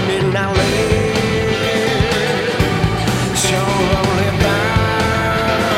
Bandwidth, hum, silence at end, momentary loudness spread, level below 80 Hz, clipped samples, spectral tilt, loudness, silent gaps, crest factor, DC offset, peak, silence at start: 16.5 kHz; none; 0 s; 1 LU; -30 dBFS; under 0.1%; -4.5 dB/octave; -15 LUFS; none; 14 dB; under 0.1%; -2 dBFS; 0 s